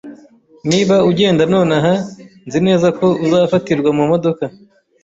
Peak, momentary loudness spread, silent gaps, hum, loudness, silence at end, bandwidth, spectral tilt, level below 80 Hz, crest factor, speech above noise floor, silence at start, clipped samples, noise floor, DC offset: -2 dBFS; 10 LU; none; none; -14 LUFS; 0.55 s; 8 kHz; -6 dB/octave; -52 dBFS; 12 dB; 32 dB; 0.05 s; under 0.1%; -45 dBFS; under 0.1%